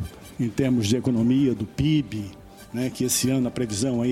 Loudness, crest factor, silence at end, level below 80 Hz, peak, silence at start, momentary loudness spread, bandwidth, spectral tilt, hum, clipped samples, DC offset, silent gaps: -24 LUFS; 16 dB; 0 s; -48 dBFS; -8 dBFS; 0 s; 12 LU; 16.5 kHz; -5.5 dB/octave; none; under 0.1%; under 0.1%; none